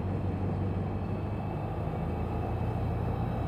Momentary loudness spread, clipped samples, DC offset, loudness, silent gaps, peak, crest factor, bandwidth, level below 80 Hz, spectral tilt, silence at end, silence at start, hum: 2 LU; under 0.1%; under 0.1%; -33 LUFS; none; -20 dBFS; 12 dB; 5.4 kHz; -42 dBFS; -9.5 dB/octave; 0 s; 0 s; none